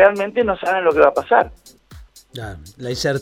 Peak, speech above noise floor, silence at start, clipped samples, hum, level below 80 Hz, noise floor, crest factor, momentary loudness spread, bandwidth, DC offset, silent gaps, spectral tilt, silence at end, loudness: 0 dBFS; 26 dB; 0 s; under 0.1%; none; -44 dBFS; -43 dBFS; 18 dB; 19 LU; 15.5 kHz; under 0.1%; none; -5 dB/octave; 0 s; -17 LUFS